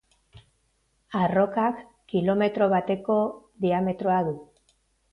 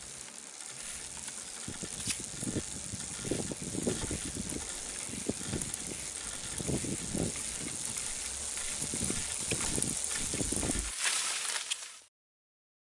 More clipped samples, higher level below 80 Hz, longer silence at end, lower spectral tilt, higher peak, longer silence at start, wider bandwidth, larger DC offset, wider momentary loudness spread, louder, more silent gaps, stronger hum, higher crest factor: neither; second, -62 dBFS vs -52 dBFS; second, 0.7 s vs 0.95 s; first, -9 dB/octave vs -2.5 dB/octave; about the same, -10 dBFS vs -10 dBFS; first, 0.35 s vs 0 s; second, 5.2 kHz vs 11.5 kHz; neither; about the same, 8 LU vs 9 LU; first, -25 LUFS vs -34 LUFS; neither; neither; second, 16 dB vs 26 dB